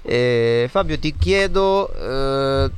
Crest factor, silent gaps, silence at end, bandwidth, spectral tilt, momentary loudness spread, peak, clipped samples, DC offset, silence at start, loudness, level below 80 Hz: 12 dB; none; 0 s; 11.5 kHz; -6 dB/octave; 6 LU; -6 dBFS; under 0.1%; under 0.1%; 0 s; -19 LUFS; -30 dBFS